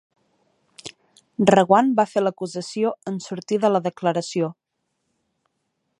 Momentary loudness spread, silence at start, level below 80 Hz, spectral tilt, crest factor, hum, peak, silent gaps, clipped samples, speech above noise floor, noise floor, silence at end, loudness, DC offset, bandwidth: 21 LU; 0.85 s; -68 dBFS; -6 dB/octave; 22 dB; none; 0 dBFS; none; under 0.1%; 55 dB; -75 dBFS; 1.45 s; -21 LUFS; under 0.1%; 11.5 kHz